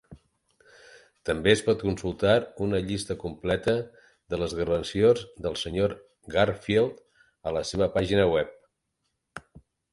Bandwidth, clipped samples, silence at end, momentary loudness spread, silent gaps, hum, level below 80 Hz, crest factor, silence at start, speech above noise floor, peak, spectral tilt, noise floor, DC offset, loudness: 11.5 kHz; under 0.1%; 0.55 s; 14 LU; none; none; -48 dBFS; 22 dB; 0.1 s; 53 dB; -6 dBFS; -5.5 dB/octave; -79 dBFS; under 0.1%; -26 LUFS